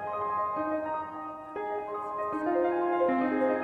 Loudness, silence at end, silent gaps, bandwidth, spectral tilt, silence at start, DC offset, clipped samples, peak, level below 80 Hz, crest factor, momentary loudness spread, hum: -30 LUFS; 0 s; none; 4.8 kHz; -7.5 dB/octave; 0 s; under 0.1%; under 0.1%; -16 dBFS; -68 dBFS; 14 dB; 10 LU; none